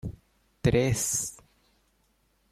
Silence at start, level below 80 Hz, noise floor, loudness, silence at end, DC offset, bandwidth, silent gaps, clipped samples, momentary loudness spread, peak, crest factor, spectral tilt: 0.05 s; -48 dBFS; -69 dBFS; -27 LUFS; 1.15 s; under 0.1%; 16 kHz; none; under 0.1%; 12 LU; -10 dBFS; 22 dB; -4.5 dB/octave